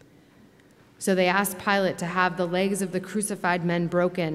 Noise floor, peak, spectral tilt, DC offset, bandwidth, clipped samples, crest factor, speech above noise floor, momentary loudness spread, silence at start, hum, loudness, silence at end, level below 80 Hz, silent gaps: -56 dBFS; -8 dBFS; -4.5 dB/octave; under 0.1%; 15.5 kHz; under 0.1%; 18 dB; 31 dB; 6 LU; 1 s; none; -25 LUFS; 0 s; -68 dBFS; none